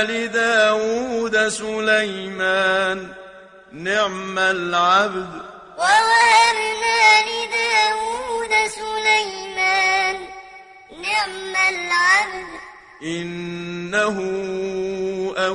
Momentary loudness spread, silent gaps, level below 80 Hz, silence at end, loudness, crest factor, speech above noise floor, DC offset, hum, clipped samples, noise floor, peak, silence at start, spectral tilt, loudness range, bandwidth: 15 LU; none; -56 dBFS; 0 s; -18 LUFS; 18 dB; 23 dB; under 0.1%; none; under 0.1%; -43 dBFS; -2 dBFS; 0 s; -2.5 dB/octave; 5 LU; 11 kHz